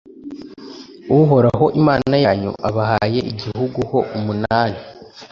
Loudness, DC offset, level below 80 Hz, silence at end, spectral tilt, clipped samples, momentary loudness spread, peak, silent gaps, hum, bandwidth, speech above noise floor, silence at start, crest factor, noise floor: -17 LUFS; under 0.1%; -44 dBFS; 0.05 s; -8.5 dB/octave; under 0.1%; 22 LU; -2 dBFS; none; none; 7.2 kHz; 20 dB; 0.15 s; 16 dB; -37 dBFS